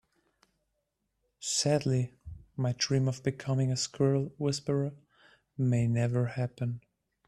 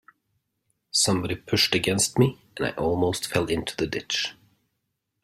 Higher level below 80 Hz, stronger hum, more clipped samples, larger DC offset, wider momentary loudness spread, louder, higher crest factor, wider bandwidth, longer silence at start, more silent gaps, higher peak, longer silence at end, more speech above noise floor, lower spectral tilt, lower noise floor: second, -62 dBFS vs -54 dBFS; neither; neither; neither; first, 11 LU vs 8 LU; second, -31 LUFS vs -24 LUFS; about the same, 18 dB vs 22 dB; second, 12 kHz vs 16 kHz; first, 1.4 s vs 0.95 s; neither; second, -14 dBFS vs -6 dBFS; second, 0.5 s vs 0.9 s; about the same, 51 dB vs 54 dB; first, -5.5 dB/octave vs -3.5 dB/octave; about the same, -81 dBFS vs -79 dBFS